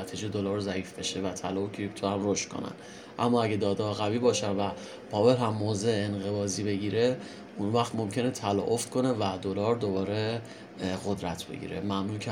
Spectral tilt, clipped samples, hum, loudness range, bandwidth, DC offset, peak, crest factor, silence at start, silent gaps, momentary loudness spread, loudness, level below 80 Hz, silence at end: -5 dB/octave; under 0.1%; none; 3 LU; 16.5 kHz; under 0.1%; -10 dBFS; 20 dB; 0 s; none; 9 LU; -30 LUFS; -66 dBFS; 0 s